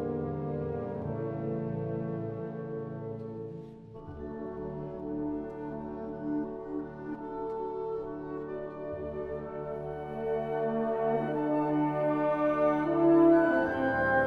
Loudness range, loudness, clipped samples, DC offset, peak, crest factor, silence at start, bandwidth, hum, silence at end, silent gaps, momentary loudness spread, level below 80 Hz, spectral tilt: 12 LU; -32 LUFS; under 0.1%; under 0.1%; -12 dBFS; 18 dB; 0 s; 5 kHz; none; 0 s; none; 13 LU; -56 dBFS; -9.5 dB/octave